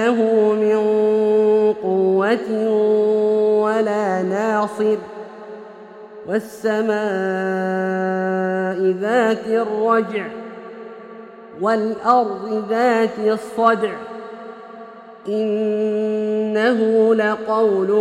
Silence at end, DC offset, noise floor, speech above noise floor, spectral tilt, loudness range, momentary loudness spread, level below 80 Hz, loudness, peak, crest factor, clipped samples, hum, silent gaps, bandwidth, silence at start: 0 s; under 0.1%; -39 dBFS; 20 dB; -6.5 dB/octave; 5 LU; 20 LU; -68 dBFS; -18 LUFS; -2 dBFS; 16 dB; under 0.1%; none; none; 11 kHz; 0 s